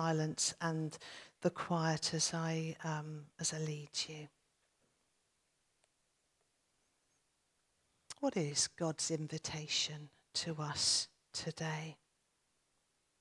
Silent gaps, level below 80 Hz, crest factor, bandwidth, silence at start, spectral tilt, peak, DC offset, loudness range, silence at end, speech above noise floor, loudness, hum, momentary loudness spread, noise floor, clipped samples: none; -78 dBFS; 20 dB; 12 kHz; 0 s; -3.5 dB/octave; -20 dBFS; under 0.1%; 8 LU; 1.25 s; 42 dB; -38 LUFS; none; 10 LU; -80 dBFS; under 0.1%